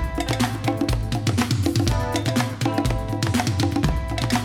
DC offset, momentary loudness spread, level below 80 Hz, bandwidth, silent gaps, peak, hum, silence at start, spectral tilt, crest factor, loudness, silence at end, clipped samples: under 0.1%; 3 LU; -32 dBFS; 17 kHz; none; -6 dBFS; none; 0 s; -5.5 dB/octave; 16 dB; -23 LUFS; 0 s; under 0.1%